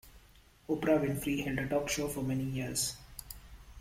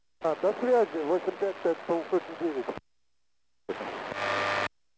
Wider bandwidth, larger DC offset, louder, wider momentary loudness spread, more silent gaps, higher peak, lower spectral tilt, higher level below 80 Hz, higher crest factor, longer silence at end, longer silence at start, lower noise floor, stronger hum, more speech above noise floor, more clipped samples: first, 16.5 kHz vs 8 kHz; neither; second, -33 LUFS vs -30 LUFS; first, 17 LU vs 12 LU; neither; about the same, -16 dBFS vs -14 dBFS; about the same, -4.5 dB/octave vs -5 dB/octave; first, -54 dBFS vs -68 dBFS; about the same, 20 dB vs 16 dB; second, 0 s vs 0.3 s; second, 0.05 s vs 0.2 s; second, -61 dBFS vs -83 dBFS; neither; second, 28 dB vs 54 dB; neither